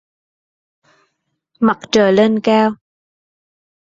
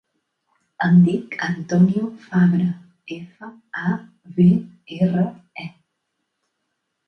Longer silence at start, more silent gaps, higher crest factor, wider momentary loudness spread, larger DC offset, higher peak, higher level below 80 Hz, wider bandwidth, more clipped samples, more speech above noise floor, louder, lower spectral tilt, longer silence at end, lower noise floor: first, 1.6 s vs 0.8 s; neither; about the same, 16 dB vs 16 dB; second, 7 LU vs 19 LU; neither; about the same, -2 dBFS vs -4 dBFS; about the same, -58 dBFS vs -62 dBFS; first, 7.8 kHz vs 6.2 kHz; neither; about the same, 58 dB vs 57 dB; first, -14 LUFS vs -19 LUFS; second, -5.5 dB/octave vs -8.5 dB/octave; second, 1.25 s vs 1.4 s; second, -71 dBFS vs -76 dBFS